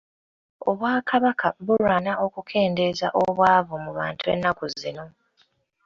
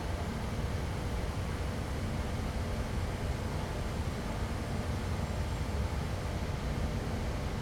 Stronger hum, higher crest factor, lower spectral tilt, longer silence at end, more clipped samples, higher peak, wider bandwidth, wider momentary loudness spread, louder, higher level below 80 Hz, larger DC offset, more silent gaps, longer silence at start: neither; first, 20 dB vs 12 dB; about the same, -6 dB/octave vs -6 dB/octave; first, 0.75 s vs 0 s; neither; first, -4 dBFS vs -22 dBFS; second, 7.6 kHz vs 17 kHz; first, 11 LU vs 1 LU; first, -23 LUFS vs -36 LUFS; second, -58 dBFS vs -40 dBFS; neither; neither; first, 0.6 s vs 0 s